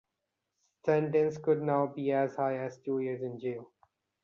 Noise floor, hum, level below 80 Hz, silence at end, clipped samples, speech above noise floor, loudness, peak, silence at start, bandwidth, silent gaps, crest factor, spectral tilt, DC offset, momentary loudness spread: -85 dBFS; none; -76 dBFS; 0.6 s; under 0.1%; 55 dB; -31 LUFS; -14 dBFS; 0.85 s; 7 kHz; none; 18 dB; -8.5 dB/octave; under 0.1%; 9 LU